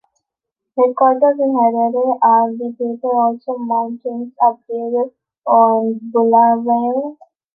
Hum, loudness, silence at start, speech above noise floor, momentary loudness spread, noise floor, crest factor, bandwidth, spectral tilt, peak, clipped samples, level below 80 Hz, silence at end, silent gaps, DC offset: none; -16 LUFS; 0.75 s; 66 dB; 12 LU; -81 dBFS; 14 dB; 2.4 kHz; -10.5 dB/octave; -2 dBFS; under 0.1%; -70 dBFS; 0.4 s; none; under 0.1%